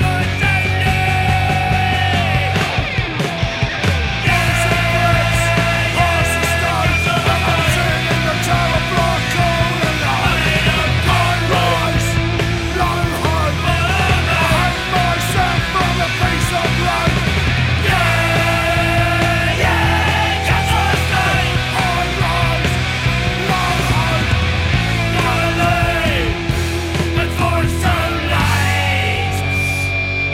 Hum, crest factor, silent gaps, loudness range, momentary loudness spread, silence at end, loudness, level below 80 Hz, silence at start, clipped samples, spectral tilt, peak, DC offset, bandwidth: none; 14 dB; none; 2 LU; 3 LU; 0 s; -15 LUFS; -26 dBFS; 0 s; under 0.1%; -4.5 dB/octave; 0 dBFS; under 0.1%; 16 kHz